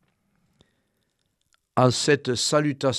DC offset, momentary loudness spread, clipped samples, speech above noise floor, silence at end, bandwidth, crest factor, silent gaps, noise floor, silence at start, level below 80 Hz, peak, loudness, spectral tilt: under 0.1%; 2 LU; under 0.1%; 52 dB; 0 s; 13 kHz; 22 dB; none; -73 dBFS; 1.75 s; -66 dBFS; -4 dBFS; -22 LUFS; -4.5 dB/octave